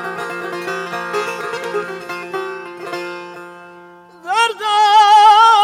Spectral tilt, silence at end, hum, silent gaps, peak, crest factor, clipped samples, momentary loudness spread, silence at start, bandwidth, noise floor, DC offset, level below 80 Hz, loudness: -2 dB/octave; 0 s; none; none; -2 dBFS; 14 dB; under 0.1%; 22 LU; 0 s; 14.5 kHz; -41 dBFS; under 0.1%; -64 dBFS; -15 LUFS